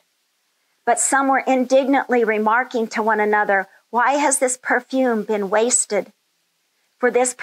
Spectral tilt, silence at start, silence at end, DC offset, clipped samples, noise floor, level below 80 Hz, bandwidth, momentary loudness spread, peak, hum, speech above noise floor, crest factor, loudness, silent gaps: -2.5 dB/octave; 0.85 s; 0 s; under 0.1%; under 0.1%; -68 dBFS; -88 dBFS; 15.5 kHz; 6 LU; -6 dBFS; none; 50 dB; 14 dB; -18 LUFS; none